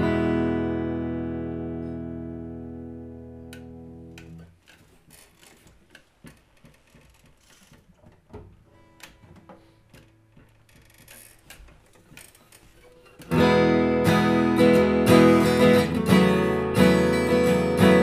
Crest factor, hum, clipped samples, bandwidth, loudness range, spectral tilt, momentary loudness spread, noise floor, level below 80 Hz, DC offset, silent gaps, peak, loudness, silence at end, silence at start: 20 dB; none; under 0.1%; 15.5 kHz; 23 LU; -6.5 dB/octave; 25 LU; -56 dBFS; -48 dBFS; under 0.1%; none; -4 dBFS; -21 LUFS; 0 s; 0 s